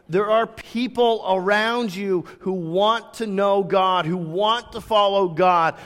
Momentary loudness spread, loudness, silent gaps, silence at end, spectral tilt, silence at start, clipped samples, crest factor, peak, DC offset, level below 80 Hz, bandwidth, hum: 8 LU; -21 LUFS; none; 0 s; -5.5 dB/octave; 0.1 s; under 0.1%; 14 dB; -6 dBFS; under 0.1%; -58 dBFS; 15.5 kHz; none